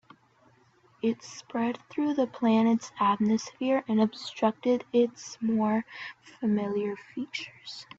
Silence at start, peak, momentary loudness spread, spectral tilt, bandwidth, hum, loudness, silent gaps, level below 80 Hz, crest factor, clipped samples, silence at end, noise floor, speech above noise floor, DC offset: 1.05 s; -12 dBFS; 12 LU; -5.5 dB/octave; 7.8 kHz; none; -28 LUFS; none; -72 dBFS; 16 dB; under 0.1%; 0.15 s; -63 dBFS; 35 dB; under 0.1%